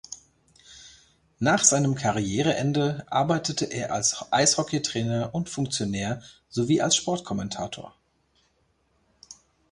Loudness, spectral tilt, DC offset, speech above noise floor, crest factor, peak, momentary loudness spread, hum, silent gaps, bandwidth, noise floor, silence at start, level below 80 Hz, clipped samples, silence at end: -25 LUFS; -3.5 dB/octave; under 0.1%; 43 dB; 22 dB; -4 dBFS; 14 LU; none; none; 11.5 kHz; -68 dBFS; 0.1 s; -56 dBFS; under 0.1%; 0.4 s